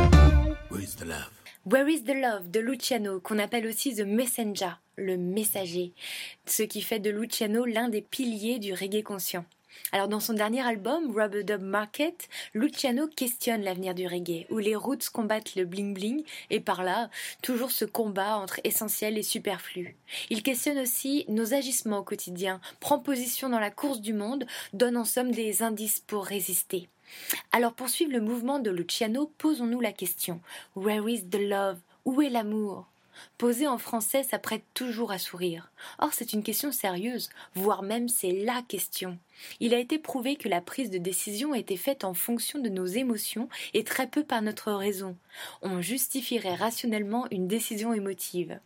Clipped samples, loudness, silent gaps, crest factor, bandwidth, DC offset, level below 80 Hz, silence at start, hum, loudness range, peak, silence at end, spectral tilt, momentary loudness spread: under 0.1%; -29 LUFS; none; 26 dB; 17 kHz; under 0.1%; -40 dBFS; 0 s; none; 2 LU; -4 dBFS; 0.05 s; -4 dB/octave; 8 LU